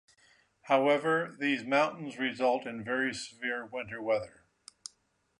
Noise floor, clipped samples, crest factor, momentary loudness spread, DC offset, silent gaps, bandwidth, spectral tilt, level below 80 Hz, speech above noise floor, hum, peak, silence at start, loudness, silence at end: -73 dBFS; under 0.1%; 20 dB; 19 LU; under 0.1%; none; 11 kHz; -4.5 dB/octave; -72 dBFS; 42 dB; none; -12 dBFS; 0.65 s; -31 LUFS; 1.1 s